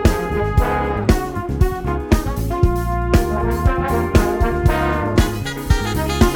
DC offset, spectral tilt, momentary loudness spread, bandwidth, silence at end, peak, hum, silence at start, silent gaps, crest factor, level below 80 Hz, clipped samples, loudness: under 0.1%; -6.5 dB/octave; 4 LU; 18 kHz; 0 s; 0 dBFS; none; 0 s; none; 16 dB; -22 dBFS; under 0.1%; -19 LUFS